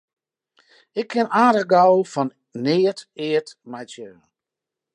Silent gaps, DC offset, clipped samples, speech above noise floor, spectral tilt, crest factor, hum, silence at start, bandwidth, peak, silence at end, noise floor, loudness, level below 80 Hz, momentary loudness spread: none; under 0.1%; under 0.1%; 67 dB; -6 dB/octave; 20 dB; none; 0.95 s; 10.5 kHz; -2 dBFS; 0.85 s; -86 dBFS; -20 LUFS; -76 dBFS; 21 LU